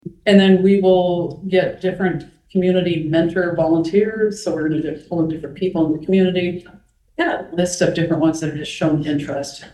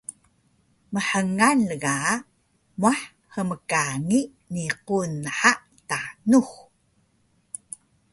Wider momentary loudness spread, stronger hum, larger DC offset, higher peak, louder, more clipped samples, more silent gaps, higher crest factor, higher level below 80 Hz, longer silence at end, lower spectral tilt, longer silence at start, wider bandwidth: second, 11 LU vs 18 LU; neither; neither; about the same, 0 dBFS vs -2 dBFS; first, -18 LUFS vs -24 LUFS; neither; neither; about the same, 18 dB vs 22 dB; first, -50 dBFS vs -62 dBFS; second, 0.05 s vs 1.55 s; first, -6 dB/octave vs -4 dB/octave; about the same, 0.05 s vs 0.1 s; about the same, 12 kHz vs 11.5 kHz